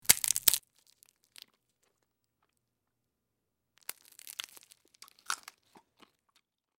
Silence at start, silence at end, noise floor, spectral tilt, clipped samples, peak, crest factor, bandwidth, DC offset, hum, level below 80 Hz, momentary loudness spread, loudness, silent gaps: 0.1 s; 1.45 s; -85 dBFS; 1.5 dB/octave; under 0.1%; 0 dBFS; 38 dB; 17.5 kHz; under 0.1%; none; -74 dBFS; 22 LU; -29 LUFS; none